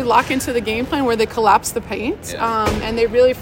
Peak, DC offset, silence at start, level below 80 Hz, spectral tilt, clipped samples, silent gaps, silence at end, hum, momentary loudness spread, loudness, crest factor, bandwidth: 0 dBFS; under 0.1%; 0 s; -38 dBFS; -4 dB/octave; under 0.1%; none; 0 s; none; 9 LU; -18 LUFS; 16 dB; 16.5 kHz